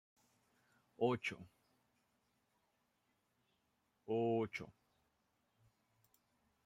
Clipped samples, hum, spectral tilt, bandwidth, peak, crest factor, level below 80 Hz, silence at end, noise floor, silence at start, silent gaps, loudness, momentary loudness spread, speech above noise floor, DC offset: under 0.1%; none; -6.5 dB/octave; 14 kHz; -22 dBFS; 24 dB; -84 dBFS; 1.95 s; -83 dBFS; 1 s; none; -40 LUFS; 19 LU; 43 dB; under 0.1%